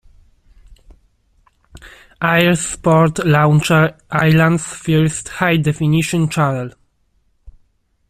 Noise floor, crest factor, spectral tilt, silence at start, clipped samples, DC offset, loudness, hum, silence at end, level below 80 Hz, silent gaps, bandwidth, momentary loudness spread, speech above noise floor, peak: -60 dBFS; 16 dB; -5.5 dB/octave; 0.7 s; under 0.1%; under 0.1%; -15 LUFS; none; 0.6 s; -46 dBFS; none; 14.5 kHz; 7 LU; 46 dB; -2 dBFS